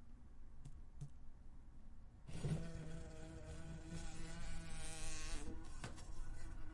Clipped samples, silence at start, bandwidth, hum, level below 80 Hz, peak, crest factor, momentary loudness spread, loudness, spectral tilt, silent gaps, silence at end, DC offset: under 0.1%; 0 s; 11.5 kHz; none; -50 dBFS; -30 dBFS; 16 dB; 17 LU; -52 LUFS; -4.5 dB/octave; none; 0 s; under 0.1%